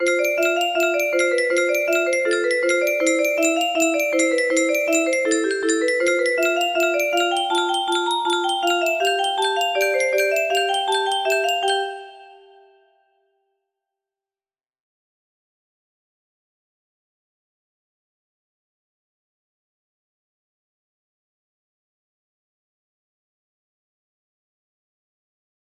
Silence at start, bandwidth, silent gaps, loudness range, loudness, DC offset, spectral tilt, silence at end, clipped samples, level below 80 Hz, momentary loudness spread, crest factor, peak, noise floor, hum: 0 s; 15.5 kHz; none; 5 LU; -19 LUFS; under 0.1%; 0 dB/octave; 13.4 s; under 0.1%; -74 dBFS; 2 LU; 18 dB; -6 dBFS; under -90 dBFS; none